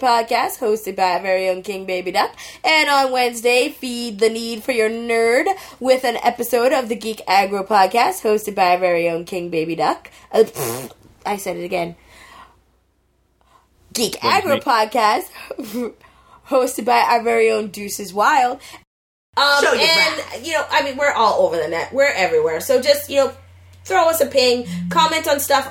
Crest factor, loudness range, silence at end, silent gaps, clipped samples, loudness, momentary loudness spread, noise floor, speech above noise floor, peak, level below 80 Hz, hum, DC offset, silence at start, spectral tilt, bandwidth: 18 dB; 6 LU; 0 s; 18.87-19.33 s; under 0.1%; -18 LUFS; 10 LU; -62 dBFS; 44 dB; 0 dBFS; -58 dBFS; none; under 0.1%; 0 s; -3 dB/octave; 17 kHz